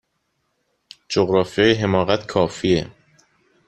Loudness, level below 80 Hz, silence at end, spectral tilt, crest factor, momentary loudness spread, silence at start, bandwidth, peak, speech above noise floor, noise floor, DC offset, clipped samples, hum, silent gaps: -19 LUFS; -52 dBFS; 0.75 s; -5.5 dB/octave; 20 dB; 5 LU; 1.1 s; 9.2 kHz; -2 dBFS; 53 dB; -71 dBFS; under 0.1%; under 0.1%; none; none